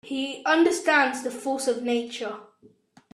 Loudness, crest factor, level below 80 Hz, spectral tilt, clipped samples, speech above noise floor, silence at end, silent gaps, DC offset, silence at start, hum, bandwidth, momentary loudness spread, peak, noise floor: -24 LUFS; 18 dB; -74 dBFS; -2 dB/octave; under 0.1%; 33 dB; 0.7 s; none; under 0.1%; 0.05 s; none; 13.5 kHz; 13 LU; -8 dBFS; -58 dBFS